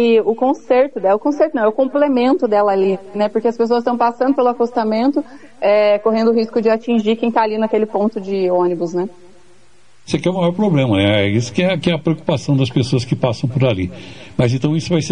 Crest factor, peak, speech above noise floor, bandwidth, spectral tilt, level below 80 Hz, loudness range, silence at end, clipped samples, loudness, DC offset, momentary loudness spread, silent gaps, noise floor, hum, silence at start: 14 dB; -2 dBFS; 38 dB; 10 kHz; -7 dB/octave; -52 dBFS; 3 LU; 0 s; under 0.1%; -16 LUFS; 0.8%; 5 LU; none; -53 dBFS; none; 0 s